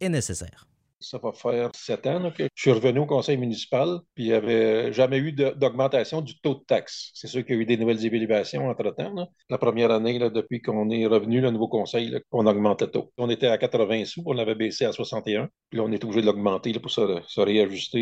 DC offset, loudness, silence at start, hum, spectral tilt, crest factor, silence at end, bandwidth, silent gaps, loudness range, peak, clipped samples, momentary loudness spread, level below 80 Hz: under 0.1%; -25 LUFS; 0 s; none; -6 dB/octave; 20 dB; 0 s; 11.5 kHz; none; 2 LU; -6 dBFS; under 0.1%; 8 LU; -64 dBFS